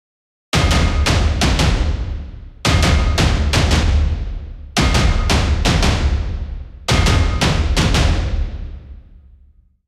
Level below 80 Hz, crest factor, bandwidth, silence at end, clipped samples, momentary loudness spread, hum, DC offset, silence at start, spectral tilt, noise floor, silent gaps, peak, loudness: -20 dBFS; 14 dB; 14 kHz; 0.9 s; under 0.1%; 13 LU; none; under 0.1%; 0.55 s; -4.5 dB/octave; -50 dBFS; none; -2 dBFS; -17 LUFS